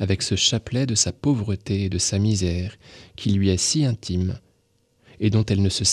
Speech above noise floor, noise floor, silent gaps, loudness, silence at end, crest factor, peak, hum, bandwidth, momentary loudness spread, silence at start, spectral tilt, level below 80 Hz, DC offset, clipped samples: 43 dB; -65 dBFS; none; -22 LUFS; 0 s; 18 dB; -4 dBFS; none; 12.5 kHz; 7 LU; 0 s; -4.5 dB/octave; -44 dBFS; under 0.1%; under 0.1%